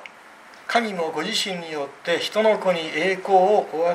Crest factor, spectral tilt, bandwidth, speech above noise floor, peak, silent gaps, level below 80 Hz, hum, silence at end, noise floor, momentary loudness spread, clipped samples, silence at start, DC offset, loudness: 18 dB; -3.5 dB/octave; 15 kHz; 24 dB; -6 dBFS; none; -76 dBFS; none; 0 s; -46 dBFS; 11 LU; under 0.1%; 0 s; under 0.1%; -22 LUFS